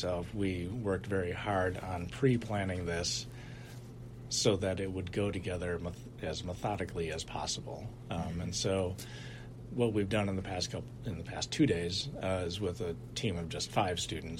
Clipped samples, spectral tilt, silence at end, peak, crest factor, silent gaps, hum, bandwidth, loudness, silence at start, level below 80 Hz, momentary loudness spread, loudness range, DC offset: under 0.1%; -5 dB/octave; 0 s; -14 dBFS; 20 dB; none; none; 16 kHz; -35 LUFS; 0 s; -54 dBFS; 13 LU; 3 LU; under 0.1%